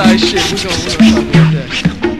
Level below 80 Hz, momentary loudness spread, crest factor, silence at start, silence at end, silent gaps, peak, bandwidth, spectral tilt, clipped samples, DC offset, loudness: -30 dBFS; 6 LU; 10 dB; 0 s; 0 s; none; 0 dBFS; 13.5 kHz; -5 dB/octave; 0.2%; 2%; -11 LUFS